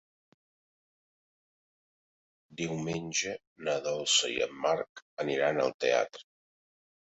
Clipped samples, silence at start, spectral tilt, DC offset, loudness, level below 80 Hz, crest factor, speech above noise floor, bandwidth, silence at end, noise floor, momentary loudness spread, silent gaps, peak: under 0.1%; 2.5 s; -2.5 dB/octave; under 0.1%; -31 LUFS; -72 dBFS; 22 dB; over 59 dB; 8.2 kHz; 0.95 s; under -90 dBFS; 12 LU; 3.47-3.56 s, 4.89-4.95 s, 5.02-5.17 s, 5.74-5.79 s; -14 dBFS